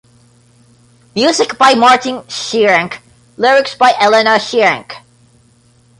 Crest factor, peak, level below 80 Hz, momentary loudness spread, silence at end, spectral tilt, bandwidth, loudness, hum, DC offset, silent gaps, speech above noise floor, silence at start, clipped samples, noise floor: 14 dB; 0 dBFS; -58 dBFS; 15 LU; 1 s; -2.5 dB/octave; 11.5 kHz; -11 LUFS; none; under 0.1%; none; 38 dB; 1.15 s; under 0.1%; -50 dBFS